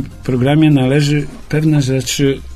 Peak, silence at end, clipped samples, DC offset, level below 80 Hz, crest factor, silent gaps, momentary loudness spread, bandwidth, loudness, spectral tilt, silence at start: 0 dBFS; 0 s; under 0.1%; under 0.1%; -36 dBFS; 14 dB; none; 8 LU; 14 kHz; -14 LUFS; -6 dB/octave; 0 s